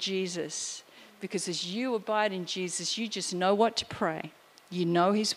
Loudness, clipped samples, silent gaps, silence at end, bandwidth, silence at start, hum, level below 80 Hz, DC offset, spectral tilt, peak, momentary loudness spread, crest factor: -30 LUFS; under 0.1%; none; 0 s; 15.5 kHz; 0 s; none; -72 dBFS; under 0.1%; -3.5 dB/octave; -12 dBFS; 12 LU; 20 dB